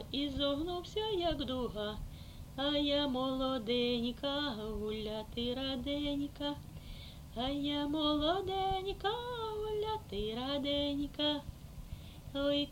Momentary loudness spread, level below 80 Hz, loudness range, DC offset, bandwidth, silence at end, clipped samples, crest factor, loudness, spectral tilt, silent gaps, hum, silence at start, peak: 15 LU; -50 dBFS; 3 LU; under 0.1%; 16.5 kHz; 0 s; under 0.1%; 16 dB; -36 LUFS; -5.5 dB/octave; none; none; 0 s; -20 dBFS